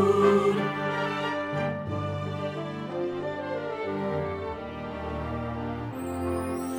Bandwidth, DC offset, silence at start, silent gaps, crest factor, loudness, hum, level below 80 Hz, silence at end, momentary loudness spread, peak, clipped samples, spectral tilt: over 20 kHz; under 0.1%; 0 s; none; 20 dB; -29 LUFS; none; -50 dBFS; 0 s; 10 LU; -8 dBFS; under 0.1%; -6.5 dB/octave